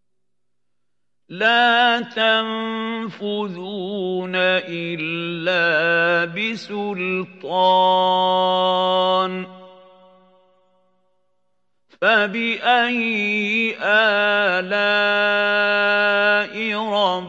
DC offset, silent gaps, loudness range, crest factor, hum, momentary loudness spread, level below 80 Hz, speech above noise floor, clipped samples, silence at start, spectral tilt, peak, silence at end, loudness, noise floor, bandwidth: under 0.1%; none; 6 LU; 18 dB; none; 10 LU; -82 dBFS; 62 dB; under 0.1%; 1.3 s; -5 dB/octave; -4 dBFS; 0 s; -18 LUFS; -81 dBFS; 8 kHz